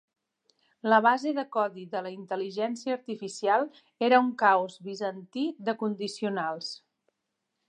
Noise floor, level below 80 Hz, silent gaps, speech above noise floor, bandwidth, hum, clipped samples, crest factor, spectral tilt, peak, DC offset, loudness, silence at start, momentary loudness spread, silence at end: -83 dBFS; -88 dBFS; none; 55 dB; 10.5 kHz; none; under 0.1%; 22 dB; -4.5 dB/octave; -6 dBFS; under 0.1%; -28 LUFS; 0.85 s; 13 LU; 0.95 s